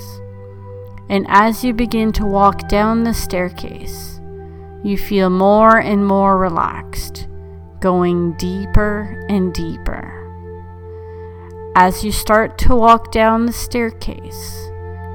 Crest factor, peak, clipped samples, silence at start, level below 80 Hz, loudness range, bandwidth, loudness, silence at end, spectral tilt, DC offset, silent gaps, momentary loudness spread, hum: 16 dB; 0 dBFS; under 0.1%; 0 s; -28 dBFS; 5 LU; 19 kHz; -15 LUFS; 0 s; -6 dB/octave; under 0.1%; none; 22 LU; none